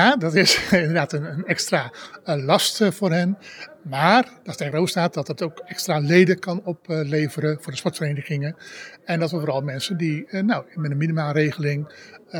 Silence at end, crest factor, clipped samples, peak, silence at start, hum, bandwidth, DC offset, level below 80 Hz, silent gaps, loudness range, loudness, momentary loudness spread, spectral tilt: 0 s; 20 dB; under 0.1%; -2 dBFS; 0 s; none; over 20 kHz; under 0.1%; -62 dBFS; none; 5 LU; -22 LUFS; 13 LU; -5 dB/octave